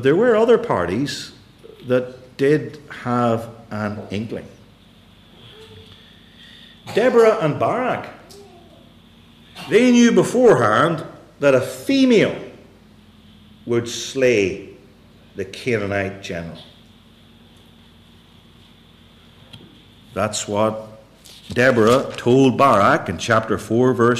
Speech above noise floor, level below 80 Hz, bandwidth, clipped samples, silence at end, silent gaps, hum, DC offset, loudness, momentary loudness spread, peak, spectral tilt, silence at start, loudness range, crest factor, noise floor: 31 dB; -56 dBFS; 14.5 kHz; under 0.1%; 0 s; none; 50 Hz at -55 dBFS; under 0.1%; -18 LUFS; 19 LU; -4 dBFS; -5.5 dB/octave; 0 s; 12 LU; 16 dB; -49 dBFS